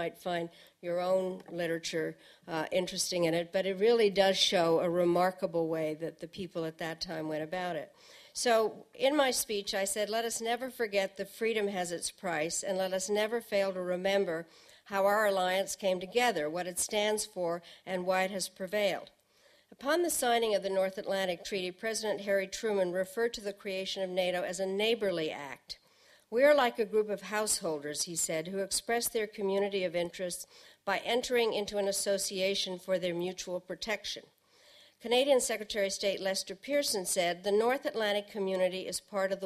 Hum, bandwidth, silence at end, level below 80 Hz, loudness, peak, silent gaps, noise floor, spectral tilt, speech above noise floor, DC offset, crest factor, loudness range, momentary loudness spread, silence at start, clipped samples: none; 15 kHz; 0 s; -68 dBFS; -32 LUFS; -12 dBFS; none; -66 dBFS; -3 dB/octave; 34 dB; under 0.1%; 20 dB; 4 LU; 10 LU; 0 s; under 0.1%